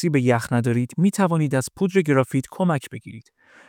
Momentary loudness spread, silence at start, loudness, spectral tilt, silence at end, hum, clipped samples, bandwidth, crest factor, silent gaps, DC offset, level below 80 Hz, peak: 8 LU; 0 s; -21 LUFS; -7 dB/octave; 0.5 s; none; under 0.1%; 17.5 kHz; 16 dB; none; under 0.1%; -62 dBFS; -4 dBFS